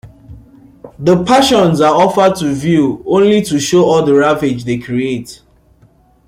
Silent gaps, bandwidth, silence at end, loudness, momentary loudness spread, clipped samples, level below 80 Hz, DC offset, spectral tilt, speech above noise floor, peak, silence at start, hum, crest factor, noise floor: none; 16 kHz; 0.95 s; -12 LUFS; 8 LU; under 0.1%; -44 dBFS; under 0.1%; -5.5 dB/octave; 37 dB; 0 dBFS; 0.05 s; none; 12 dB; -49 dBFS